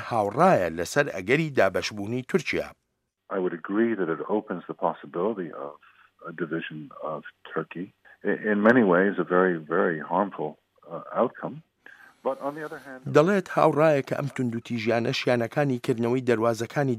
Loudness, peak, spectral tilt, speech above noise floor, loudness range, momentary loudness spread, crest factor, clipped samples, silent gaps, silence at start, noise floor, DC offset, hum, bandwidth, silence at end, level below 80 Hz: -25 LUFS; -6 dBFS; -6.5 dB/octave; 53 dB; 8 LU; 17 LU; 20 dB; under 0.1%; none; 0 s; -78 dBFS; under 0.1%; none; 15.5 kHz; 0 s; -68 dBFS